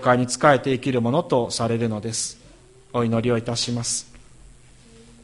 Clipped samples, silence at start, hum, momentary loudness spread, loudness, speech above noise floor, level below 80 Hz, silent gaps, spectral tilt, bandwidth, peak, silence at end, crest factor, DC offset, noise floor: under 0.1%; 0 s; none; 9 LU; -22 LUFS; 28 dB; -52 dBFS; none; -4.5 dB/octave; 11.5 kHz; -2 dBFS; 1.05 s; 20 dB; under 0.1%; -49 dBFS